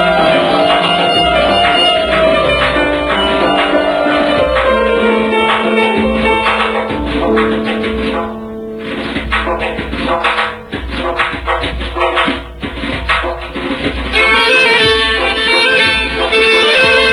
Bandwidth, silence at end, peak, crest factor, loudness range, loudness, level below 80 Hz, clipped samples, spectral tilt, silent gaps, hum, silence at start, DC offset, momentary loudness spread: 12 kHz; 0 s; 0 dBFS; 12 dB; 6 LU; -12 LUFS; -28 dBFS; under 0.1%; -4.5 dB/octave; none; none; 0 s; 0.2%; 11 LU